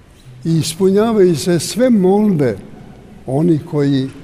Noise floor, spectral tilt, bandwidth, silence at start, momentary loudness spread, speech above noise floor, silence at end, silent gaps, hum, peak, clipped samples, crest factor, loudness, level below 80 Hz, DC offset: -37 dBFS; -6.5 dB/octave; 16 kHz; 0.25 s; 9 LU; 23 dB; 0 s; none; none; -2 dBFS; under 0.1%; 12 dB; -14 LUFS; -48 dBFS; under 0.1%